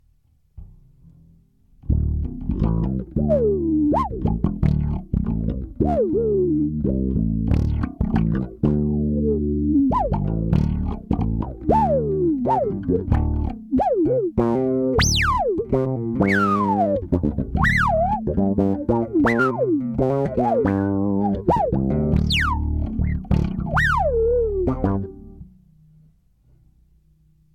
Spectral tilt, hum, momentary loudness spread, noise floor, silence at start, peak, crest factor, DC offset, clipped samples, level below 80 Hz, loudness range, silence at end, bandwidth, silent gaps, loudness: -6.5 dB/octave; none; 6 LU; -59 dBFS; 0.55 s; -6 dBFS; 14 dB; under 0.1%; under 0.1%; -30 dBFS; 3 LU; 2.05 s; 13 kHz; none; -21 LUFS